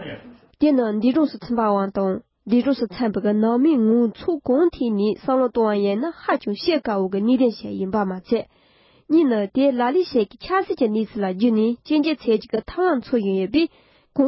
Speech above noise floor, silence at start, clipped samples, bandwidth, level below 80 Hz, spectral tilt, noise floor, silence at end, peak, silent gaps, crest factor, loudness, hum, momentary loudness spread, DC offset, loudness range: 36 dB; 0 s; under 0.1%; 5.8 kHz; -54 dBFS; -11 dB/octave; -56 dBFS; 0 s; -6 dBFS; none; 14 dB; -21 LUFS; none; 6 LU; under 0.1%; 2 LU